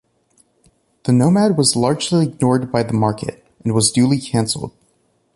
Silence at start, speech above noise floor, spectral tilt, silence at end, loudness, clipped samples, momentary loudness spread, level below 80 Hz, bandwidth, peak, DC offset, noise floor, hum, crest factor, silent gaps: 1.05 s; 46 dB; -5 dB/octave; 0.65 s; -17 LUFS; under 0.1%; 13 LU; -50 dBFS; 11.5 kHz; -2 dBFS; under 0.1%; -62 dBFS; none; 16 dB; none